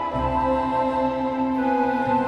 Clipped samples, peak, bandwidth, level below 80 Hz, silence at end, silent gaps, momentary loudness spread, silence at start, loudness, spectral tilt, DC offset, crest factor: under 0.1%; -10 dBFS; 8.4 kHz; -40 dBFS; 0 s; none; 2 LU; 0 s; -23 LUFS; -7.5 dB/octave; under 0.1%; 12 dB